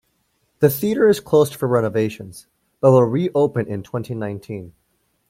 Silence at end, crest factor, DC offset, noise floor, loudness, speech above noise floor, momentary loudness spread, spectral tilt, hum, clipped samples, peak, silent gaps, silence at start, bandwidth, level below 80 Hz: 0.6 s; 18 dB; under 0.1%; -67 dBFS; -19 LUFS; 49 dB; 16 LU; -7 dB/octave; none; under 0.1%; -2 dBFS; none; 0.6 s; 16.5 kHz; -58 dBFS